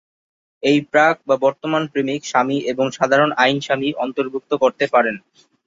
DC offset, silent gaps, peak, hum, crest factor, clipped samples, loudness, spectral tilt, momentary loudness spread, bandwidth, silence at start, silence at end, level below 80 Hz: under 0.1%; none; -2 dBFS; none; 16 dB; under 0.1%; -18 LUFS; -5 dB/octave; 7 LU; 7.8 kHz; 0.65 s; 0.5 s; -64 dBFS